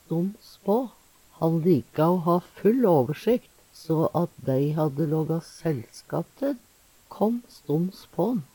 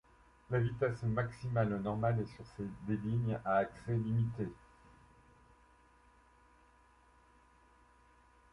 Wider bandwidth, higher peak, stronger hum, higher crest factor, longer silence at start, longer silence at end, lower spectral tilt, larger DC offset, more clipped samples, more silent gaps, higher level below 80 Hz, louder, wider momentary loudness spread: first, 18.5 kHz vs 10.5 kHz; first, -10 dBFS vs -20 dBFS; neither; about the same, 16 dB vs 20 dB; second, 0.1 s vs 0.5 s; second, 0.1 s vs 4 s; about the same, -8.5 dB/octave vs -9 dB/octave; neither; neither; neither; about the same, -64 dBFS vs -62 dBFS; first, -26 LUFS vs -36 LUFS; about the same, 11 LU vs 10 LU